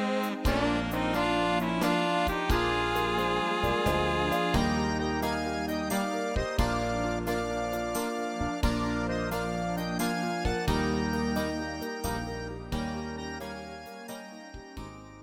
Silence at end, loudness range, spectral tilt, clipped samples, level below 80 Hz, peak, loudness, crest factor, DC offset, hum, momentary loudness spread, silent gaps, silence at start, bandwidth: 0 s; 6 LU; -5 dB/octave; under 0.1%; -40 dBFS; -12 dBFS; -29 LUFS; 16 dB; under 0.1%; none; 12 LU; none; 0 s; 16.5 kHz